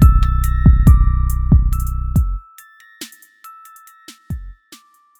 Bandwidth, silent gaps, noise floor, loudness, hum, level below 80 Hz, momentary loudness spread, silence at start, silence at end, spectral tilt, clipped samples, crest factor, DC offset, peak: 16 kHz; none; -47 dBFS; -16 LUFS; none; -16 dBFS; 22 LU; 0 s; 0.65 s; -7.5 dB/octave; under 0.1%; 14 dB; under 0.1%; 0 dBFS